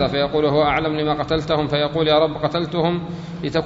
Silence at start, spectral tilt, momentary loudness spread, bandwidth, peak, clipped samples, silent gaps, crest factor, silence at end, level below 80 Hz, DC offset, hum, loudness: 0 s; -7 dB/octave; 6 LU; 7.8 kHz; -4 dBFS; under 0.1%; none; 16 dB; 0 s; -42 dBFS; under 0.1%; none; -20 LUFS